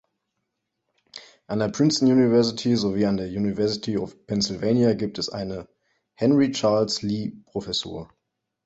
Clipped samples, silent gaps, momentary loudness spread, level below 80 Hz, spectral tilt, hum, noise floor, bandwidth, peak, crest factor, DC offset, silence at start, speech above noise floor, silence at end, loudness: under 0.1%; none; 15 LU; -56 dBFS; -5.5 dB/octave; none; -79 dBFS; 8.2 kHz; -8 dBFS; 16 dB; under 0.1%; 1.15 s; 56 dB; 0.6 s; -23 LUFS